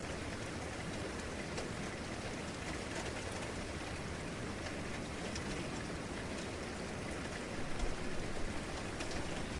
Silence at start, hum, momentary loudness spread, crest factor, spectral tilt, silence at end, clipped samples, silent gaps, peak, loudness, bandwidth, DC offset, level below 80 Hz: 0 s; none; 2 LU; 16 dB; -4.5 dB/octave; 0 s; under 0.1%; none; -26 dBFS; -42 LUFS; 11.5 kHz; under 0.1%; -50 dBFS